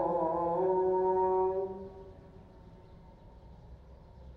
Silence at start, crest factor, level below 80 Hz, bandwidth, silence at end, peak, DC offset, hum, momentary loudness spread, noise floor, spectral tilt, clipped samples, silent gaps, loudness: 0 s; 14 dB; -56 dBFS; 4.1 kHz; 0 s; -18 dBFS; under 0.1%; none; 20 LU; -54 dBFS; -10.5 dB/octave; under 0.1%; none; -30 LUFS